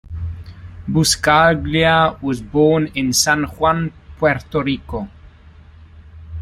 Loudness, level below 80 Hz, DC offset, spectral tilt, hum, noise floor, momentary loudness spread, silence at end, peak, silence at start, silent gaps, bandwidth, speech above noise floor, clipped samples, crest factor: -16 LUFS; -38 dBFS; under 0.1%; -4 dB/octave; none; -43 dBFS; 17 LU; 0 s; -2 dBFS; 0.1 s; none; 15.5 kHz; 27 dB; under 0.1%; 16 dB